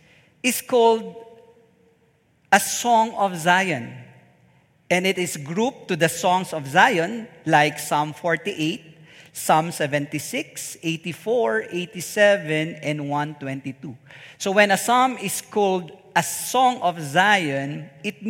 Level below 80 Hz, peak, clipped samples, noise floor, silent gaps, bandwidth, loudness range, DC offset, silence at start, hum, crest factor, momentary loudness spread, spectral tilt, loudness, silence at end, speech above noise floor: -70 dBFS; 0 dBFS; under 0.1%; -62 dBFS; none; 16.5 kHz; 4 LU; under 0.1%; 0.45 s; none; 22 dB; 13 LU; -3.5 dB/octave; -21 LUFS; 0 s; 40 dB